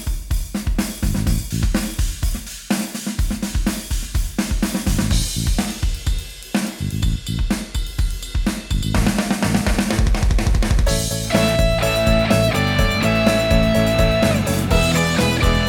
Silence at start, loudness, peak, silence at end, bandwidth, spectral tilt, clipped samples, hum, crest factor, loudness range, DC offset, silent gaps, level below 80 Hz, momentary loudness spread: 0 s; -20 LUFS; -2 dBFS; 0 s; 18.5 kHz; -5 dB/octave; under 0.1%; none; 16 dB; 7 LU; under 0.1%; none; -22 dBFS; 8 LU